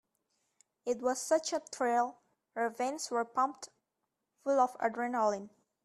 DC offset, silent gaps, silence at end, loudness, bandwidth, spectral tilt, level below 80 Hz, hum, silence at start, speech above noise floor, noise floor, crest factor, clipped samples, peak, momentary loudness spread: under 0.1%; none; 0.35 s; -33 LUFS; 14 kHz; -2.5 dB/octave; -82 dBFS; none; 0.85 s; 53 dB; -85 dBFS; 18 dB; under 0.1%; -16 dBFS; 12 LU